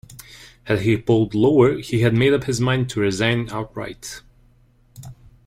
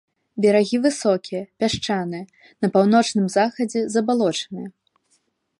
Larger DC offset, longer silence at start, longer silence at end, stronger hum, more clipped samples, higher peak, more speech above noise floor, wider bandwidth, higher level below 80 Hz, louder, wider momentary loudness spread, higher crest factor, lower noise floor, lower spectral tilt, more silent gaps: neither; second, 0.1 s vs 0.35 s; second, 0.35 s vs 0.9 s; neither; neither; about the same, -4 dBFS vs -4 dBFS; second, 36 dB vs 47 dB; first, 15.5 kHz vs 11.5 kHz; first, -48 dBFS vs -60 dBFS; about the same, -19 LUFS vs -21 LUFS; first, 18 LU vs 15 LU; about the same, 16 dB vs 16 dB; second, -55 dBFS vs -67 dBFS; about the same, -6 dB/octave vs -5 dB/octave; neither